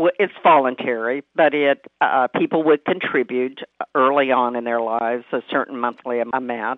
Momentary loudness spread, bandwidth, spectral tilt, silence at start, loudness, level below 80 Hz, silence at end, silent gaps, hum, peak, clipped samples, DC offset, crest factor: 8 LU; 4.2 kHz; -8 dB/octave; 0 s; -20 LUFS; -76 dBFS; 0 s; none; none; -2 dBFS; under 0.1%; under 0.1%; 18 dB